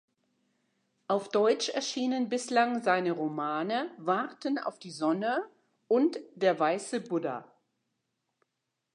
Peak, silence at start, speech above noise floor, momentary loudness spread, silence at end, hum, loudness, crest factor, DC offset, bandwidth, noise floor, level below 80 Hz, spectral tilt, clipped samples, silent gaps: -12 dBFS; 1.1 s; 54 dB; 7 LU; 1.5 s; none; -30 LUFS; 20 dB; under 0.1%; 11 kHz; -84 dBFS; -88 dBFS; -4.5 dB/octave; under 0.1%; none